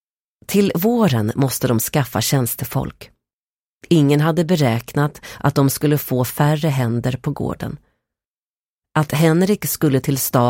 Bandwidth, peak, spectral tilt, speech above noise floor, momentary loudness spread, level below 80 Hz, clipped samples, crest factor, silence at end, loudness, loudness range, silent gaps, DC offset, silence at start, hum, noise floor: 17 kHz; -4 dBFS; -6 dB/octave; over 73 dB; 8 LU; -48 dBFS; under 0.1%; 16 dB; 0 s; -18 LUFS; 3 LU; 3.33-3.80 s, 8.26-8.79 s; under 0.1%; 0.5 s; none; under -90 dBFS